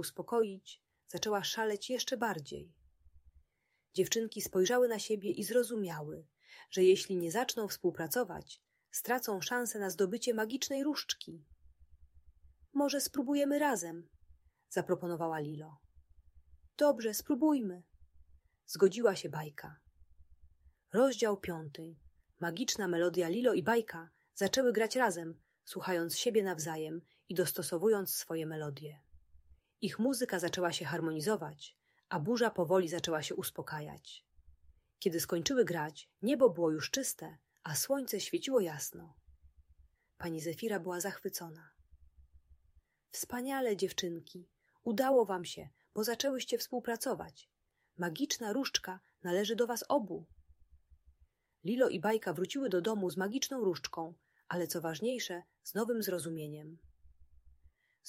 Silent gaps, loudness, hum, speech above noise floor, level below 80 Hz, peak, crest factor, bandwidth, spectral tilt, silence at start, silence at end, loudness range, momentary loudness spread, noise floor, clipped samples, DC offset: none; -35 LUFS; none; 46 dB; -70 dBFS; -14 dBFS; 22 dB; 16 kHz; -4 dB/octave; 0 s; 0.6 s; 5 LU; 16 LU; -80 dBFS; under 0.1%; under 0.1%